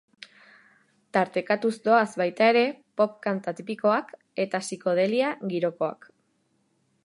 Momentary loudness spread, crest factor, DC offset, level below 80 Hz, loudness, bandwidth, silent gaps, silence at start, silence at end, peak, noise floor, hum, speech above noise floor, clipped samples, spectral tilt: 10 LU; 20 dB; under 0.1%; -80 dBFS; -25 LUFS; 11.5 kHz; none; 1.15 s; 1.1 s; -6 dBFS; -70 dBFS; none; 45 dB; under 0.1%; -5 dB/octave